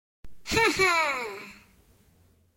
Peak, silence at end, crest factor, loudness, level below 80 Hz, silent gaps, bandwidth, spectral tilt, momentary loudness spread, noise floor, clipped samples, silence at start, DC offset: -10 dBFS; 1 s; 18 dB; -24 LUFS; -52 dBFS; none; 16.5 kHz; -2.5 dB/octave; 22 LU; -62 dBFS; under 0.1%; 0.25 s; under 0.1%